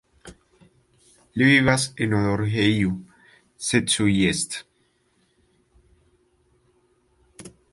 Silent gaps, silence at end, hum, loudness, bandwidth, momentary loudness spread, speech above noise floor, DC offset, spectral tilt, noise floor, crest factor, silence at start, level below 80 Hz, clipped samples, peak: none; 0.25 s; none; -21 LUFS; 11.5 kHz; 13 LU; 45 dB; under 0.1%; -4.5 dB/octave; -66 dBFS; 20 dB; 0.25 s; -50 dBFS; under 0.1%; -4 dBFS